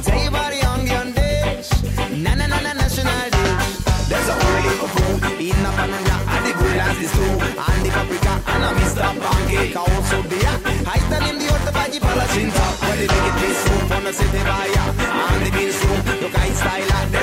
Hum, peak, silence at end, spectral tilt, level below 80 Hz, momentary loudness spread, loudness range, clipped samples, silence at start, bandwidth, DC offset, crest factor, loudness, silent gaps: none; -6 dBFS; 0 s; -4.5 dB/octave; -24 dBFS; 3 LU; 1 LU; under 0.1%; 0 s; 16 kHz; under 0.1%; 12 dB; -19 LUFS; none